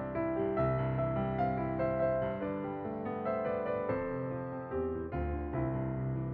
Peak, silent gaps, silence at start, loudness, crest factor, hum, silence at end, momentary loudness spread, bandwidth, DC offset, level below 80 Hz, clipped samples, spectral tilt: -20 dBFS; none; 0 s; -35 LUFS; 14 dB; none; 0 s; 6 LU; 4.6 kHz; under 0.1%; -50 dBFS; under 0.1%; -8.5 dB/octave